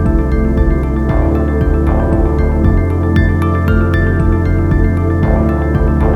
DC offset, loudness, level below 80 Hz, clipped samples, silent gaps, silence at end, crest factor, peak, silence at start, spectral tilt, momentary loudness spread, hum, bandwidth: under 0.1%; -13 LUFS; -14 dBFS; under 0.1%; none; 0 s; 10 dB; 0 dBFS; 0 s; -9.5 dB/octave; 1 LU; none; 5.6 kHz